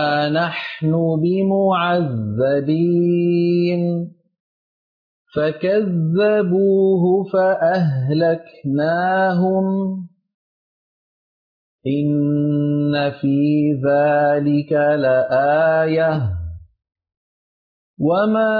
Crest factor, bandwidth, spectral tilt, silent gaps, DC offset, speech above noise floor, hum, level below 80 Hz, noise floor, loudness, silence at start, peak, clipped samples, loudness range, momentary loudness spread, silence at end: 10 dB; 5.2 kHz; -10 dB/octave; 4.40-5.25 s, 10.34-11.79 s, 17.17-17.97 s; under 0.1%; over 73 dB; none; -50 dBFS; under -90 dBFS; -18 LUFS; 0 s; -8 dBFS; under 0.1%; 5 LU; 7 LU; 0 s